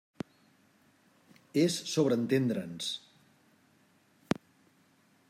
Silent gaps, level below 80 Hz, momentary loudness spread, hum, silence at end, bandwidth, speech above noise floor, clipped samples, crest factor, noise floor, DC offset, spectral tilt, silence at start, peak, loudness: none; -74 dBFS; 16 LU; none; 2.3 s; 16 kHz; 37 dB; under 0.1%; 22 dB; -67 dBFS; under 0.1%; -5 dB/octave; 1.55 s; -12 dBFS; -31 LUFS